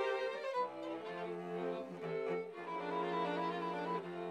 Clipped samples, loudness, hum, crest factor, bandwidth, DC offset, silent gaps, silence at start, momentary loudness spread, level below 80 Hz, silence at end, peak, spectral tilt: under 0.1%; -41 LUFS; none; 14 dB; 11.5 kHz; under 0.1%; none; 0 s; 6 LU; under -90 dBFS; 0 s; -26 dBFS; -6.5 dB/octave